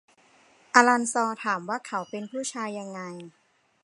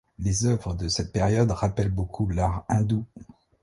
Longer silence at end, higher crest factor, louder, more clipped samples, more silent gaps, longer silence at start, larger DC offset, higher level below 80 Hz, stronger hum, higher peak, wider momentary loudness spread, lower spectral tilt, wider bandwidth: first, 0.55 s vs 0.4 s; first, 26 dB vs 16 dB; about the same, -25 LUFS vs -26 LUFS; neither; neither; first, 0.75 s vs 0.2 s; neither; second, -82 dBFS vs -38 dBFS; neither; first, 0 dBFS vs -8 dBFS; first, 18 LU vs 5 LU; second, -3 dB/octave vs -6 dB/octave; about the same, 11.5 kHz vs 11.5 kHz